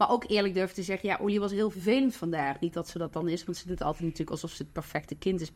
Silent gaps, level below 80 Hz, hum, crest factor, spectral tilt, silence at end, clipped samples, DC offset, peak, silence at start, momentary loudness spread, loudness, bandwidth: none; -52 dBFS; none; 18 dB; -5.5 dB/octave; 0.05 s; under 0.1%; under 0.1%; -12 dBFS; 0 s; 9 LU; -31 LUFS; 16 kHz